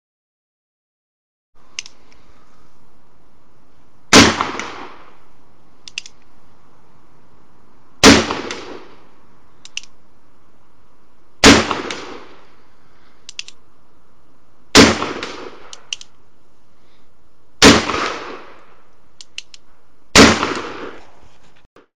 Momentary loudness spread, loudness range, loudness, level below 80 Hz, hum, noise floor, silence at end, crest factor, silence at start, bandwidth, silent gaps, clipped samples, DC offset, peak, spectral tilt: 25 LU; 1 LU; -12 LUFS; -40 dBFS; none; -57 dBFS; 0 s; 20 dB; 4.1 s; 18 kHz; 21.66-21.76 s; under 0.1%; 2%; 0 dBFS; -3 dB/octave